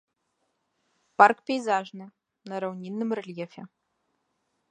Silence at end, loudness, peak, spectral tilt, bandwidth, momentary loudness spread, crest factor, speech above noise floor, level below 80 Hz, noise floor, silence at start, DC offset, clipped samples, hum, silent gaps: 1.05 s; -25 LUFS; -2 dBFS; -5.5 dB/octave; 9.4 kHz; 22 LU; 26 dB; 51 dB; -84 dBFS; -77 dBFS; 1.2 s; under 0.1%; under 0.1%; none; none